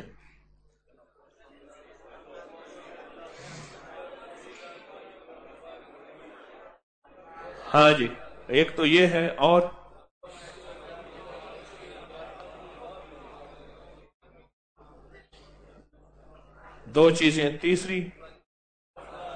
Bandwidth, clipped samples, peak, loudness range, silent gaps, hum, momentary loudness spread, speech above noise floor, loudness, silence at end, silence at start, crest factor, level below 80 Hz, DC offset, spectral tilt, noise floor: 9.4 kHz; under 0.1%; -4 dBFS; 25 LU; 6.83-7.02 s, 10.11-10.21 s, 14.14-14.20 s, 14.53-14.76 s, 18.46-18.94 s; none; 29 LU; 43 dB; -22 LUFS; 0 s; 0 s; 24 dB; -58 dBFS; under 0.1%; -5 dB/octave; -64 dBFS